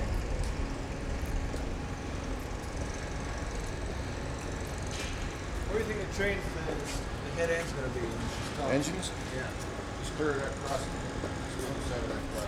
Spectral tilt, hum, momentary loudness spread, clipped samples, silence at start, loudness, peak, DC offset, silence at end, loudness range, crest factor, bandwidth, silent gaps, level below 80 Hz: -5 dB/octave; none; 6 LU; under 0.1%; 0 s; -35 LUFS; -14 dBFS; under 0.1%; 0 s; 4 LU; 20 dB; 16 kHz; none; -40 dBFS